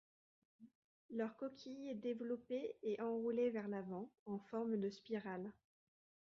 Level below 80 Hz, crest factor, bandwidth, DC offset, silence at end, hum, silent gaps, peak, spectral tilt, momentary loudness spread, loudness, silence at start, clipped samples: -86 dBFS; 16 dB; 7.2 kHz; under 0.1%; 0.8 s; none; 0.75-1.09 s, 4.19-4.26 s; -30 dBFS; -6 dB/octave; 10 LU; -45 LUFS; 0.6 s; under 0.1%